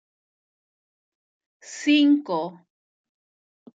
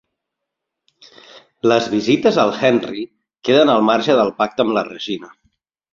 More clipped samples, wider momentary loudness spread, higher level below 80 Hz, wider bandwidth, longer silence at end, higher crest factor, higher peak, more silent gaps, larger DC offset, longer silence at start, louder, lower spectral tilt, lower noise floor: neither; first, 17 LU vs 13 LU; second, -90 dBFS vs -60 dBFS; about the same, 8 kHz vs 7.6 kHz; first, 1.3 s vs 0.65 s; about the same, 18 dB vs 16 dB; second, -8 dBFS vs -2 dBFS; neither; neither; first, 1.7 s vs 1.35 s; second, -21 LUFS vs -16 LUFS; second, -3.5 dB/octave vs -5.5 dB/octave; first, under -90 dBFS vs -80 dBFS